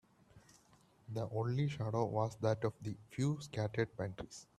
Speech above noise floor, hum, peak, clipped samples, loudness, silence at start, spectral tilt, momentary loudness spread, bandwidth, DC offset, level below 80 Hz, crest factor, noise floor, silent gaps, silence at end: 30 dB; none; -20 dBFS; under 0.1%; -39 LUFS; 0.35 s; -7 dB/octave; 9 LU; 12.5 kHz; under 0.1%; -68 dBFS; 18 dB; -68 dBFS; none; 0.15 s